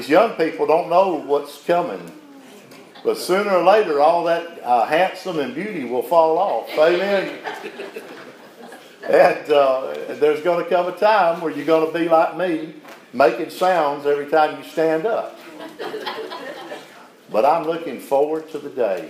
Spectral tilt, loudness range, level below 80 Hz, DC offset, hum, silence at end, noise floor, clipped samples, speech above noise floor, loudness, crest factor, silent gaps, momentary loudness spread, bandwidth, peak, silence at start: -5 dB/octave; 5 LU; -80 dBFS; under 0.1%; none; 0 s; -44 dBFS; under 0.1%; 25 dB; -19 LUFS; 18 dB; none; 17 LU; 16 kHz; -2 dBFS; 0 s